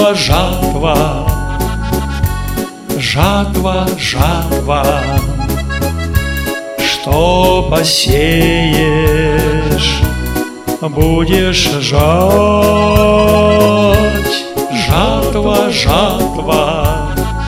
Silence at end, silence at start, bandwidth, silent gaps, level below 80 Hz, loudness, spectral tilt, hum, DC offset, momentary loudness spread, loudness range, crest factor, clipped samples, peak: 0 s; 0 s; 17 kHz; none; -20 dBFS; -12 LUFS; -5 dB/octave; none; under 0.1%; 8 LU; 5 LU; 12 dB; 0.3%; 0 dBFS